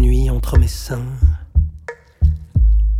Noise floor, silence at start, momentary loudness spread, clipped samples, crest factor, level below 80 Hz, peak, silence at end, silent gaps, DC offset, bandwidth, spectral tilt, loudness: -35 dBFS; 0 s; 9 LU; under 0.1%; 12 dB; -16 dBFS; -2 dBFS; 0 s; none; under 0.1%; 14.5 kHz; -7 dB/octave; -18 LUFS